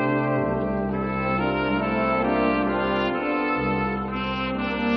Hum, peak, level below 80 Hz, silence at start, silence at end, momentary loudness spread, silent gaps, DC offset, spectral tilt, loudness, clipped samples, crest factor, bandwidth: none; -10 dBFS; -42 dBFS; 0 s; 0 s; 4 LU; none; under 0.1%; -5 dB/octave; -24 LUFS; under 0.1%; 14 dB; 6 kHz